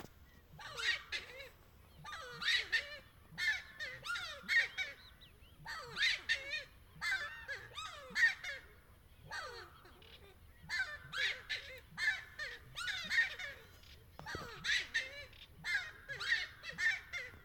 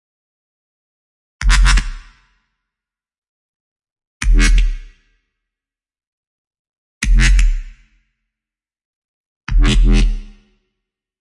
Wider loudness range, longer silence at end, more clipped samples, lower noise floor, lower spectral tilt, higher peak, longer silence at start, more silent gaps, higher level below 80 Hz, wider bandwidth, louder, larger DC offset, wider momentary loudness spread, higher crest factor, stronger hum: about the same, 4 LU vs 3 LU; second, 0 s vs 0.95 s; neither; second, -62 dBFS vs -88 dBFS; second, -0.5 dB/octave vs -4 dB/octave; second, -20 dBFS vs -2 dBFS; second, 0 s vs 1.4 s; second, none vs 3.18-3.22 s, 3.29-3.76 s, 3.92-3.96 s, 4.07-4.20 s, 6.07-6.51 s, 6.59-7.01 s, 8.85-9.41 s; second, -66 dBFS vs -18 dBFS; first, 18 kHz vs 11.5 kHz; second, -38 LUFS vs -17 LUFS; neither; first, 21 LU vs 16 LU; about the same, 20 dB vs 16 dB; neither